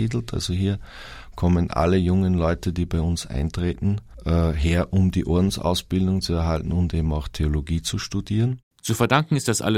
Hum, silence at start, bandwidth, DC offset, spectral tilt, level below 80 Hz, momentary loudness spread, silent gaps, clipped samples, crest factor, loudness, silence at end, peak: none; 0 s; 15.5 kHz; under 0.1%; -6 dB/octave; -32 dBFS; 6 LU; 8.63-8.71 s; under 0.1%; 22 dB; -23 LUFS; 0 s; -2 dBFS